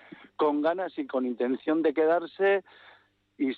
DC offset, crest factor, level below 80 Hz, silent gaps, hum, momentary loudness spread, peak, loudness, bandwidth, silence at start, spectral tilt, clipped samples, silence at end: under 0.1%; 14 dB; -80 dBFS; none; 50 Hz at -70 dBFS; 7 LU; -14 dBFS; -27 LUFS; 4.8 kHz; 0.4 s; -8 dB/octave; under 0.1%; 0 s